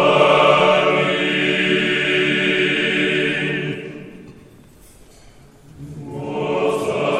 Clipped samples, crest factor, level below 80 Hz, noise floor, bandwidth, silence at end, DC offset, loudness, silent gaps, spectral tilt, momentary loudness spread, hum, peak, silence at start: under 0.1%; 18 dB; -54 dBFS; -45 dBFS; 12.5 kHz; 0 s; under 0.1%; -17 LUFS; none; -5 dB/octave; 17 LU; none; 0 dBFS; 0 s